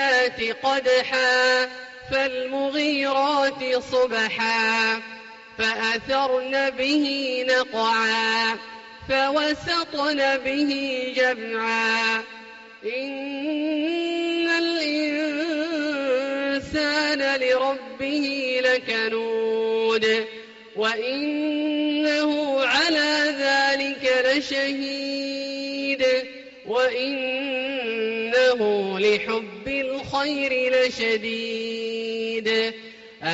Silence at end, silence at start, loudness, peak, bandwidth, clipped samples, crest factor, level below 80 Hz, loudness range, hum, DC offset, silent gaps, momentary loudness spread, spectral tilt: 0 s; 0 s; -23 LUFS; -10 dBFS; 8 kHz; under 0.1%; 14 dB; -60 dBFS; 3 LU; none; under 0.1%; none; 8 LU; -0.5 dB/octave